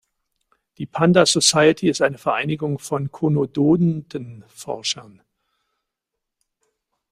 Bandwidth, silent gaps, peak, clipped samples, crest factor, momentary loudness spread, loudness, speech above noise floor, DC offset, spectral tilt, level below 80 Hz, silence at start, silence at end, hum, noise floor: 15.5 kHz; none; -2 dBFS; under 0.1%; 20 dB; 18 LU; -19 LUFS; 63 dB; under 0.1%; -4.5 dB/octave; -60 dBFS; 0.8 s; 2.1 s; none; -82 dBFS